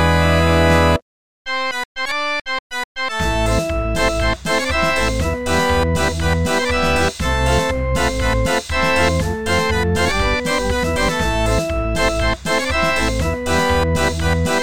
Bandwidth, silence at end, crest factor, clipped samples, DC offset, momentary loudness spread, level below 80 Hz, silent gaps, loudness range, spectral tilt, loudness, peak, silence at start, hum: 17.5 kHz; 0 s; 16 dB; under 0.1%; 3%; 6 LU; -26 dBFS; 1.02-1.45 s, 1.85-1.95 s, 2.41-2.45 s, 2.59-2.70 s, 2.84-2.95 s; 2 LU; -4.5 dB/octave; -18 LUFS; -2 dBFS; 0 s; none